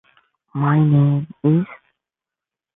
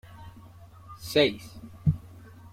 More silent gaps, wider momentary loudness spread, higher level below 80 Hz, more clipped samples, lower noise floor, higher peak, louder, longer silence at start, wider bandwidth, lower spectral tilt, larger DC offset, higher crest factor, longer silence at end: neither; second, 13 LU vs 25 LU; second, -60 dBFS vs -50 dBFS; neither; first, -88 dBFS vs -49 dBFS; about the same, -6 dBFS vs -8 dBFS; first, -18 LUFS vs -27 LUFS; first, 0.55 s vs 0.1 s; second, 3.8 kHz vs 16 kHz; first, -13.5 dB/octave vs -6 dB/octave; neither; second, 14 dB vs 22 dB; first, 1 s vs 0.05 s